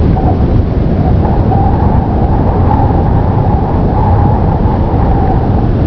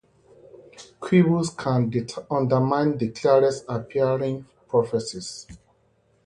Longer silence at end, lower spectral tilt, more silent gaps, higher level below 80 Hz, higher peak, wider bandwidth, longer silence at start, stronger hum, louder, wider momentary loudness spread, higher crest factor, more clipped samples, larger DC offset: second, 0 s vs 0.7 s; first, -11.5 dB/octave vs -7 dB/octave; neither; first, -14 dBFS vs -58 dBFS; first, 0 dBFS vs -6 dBFS; second, 5.4 kHz vs 11 kHz; second, 0 s vs 0.8 s; neither; first, -11 LUFS vs -23 LUFS; second, 2 LU vs 14 LU; second, 8 dB vs 18 dB; neither; neither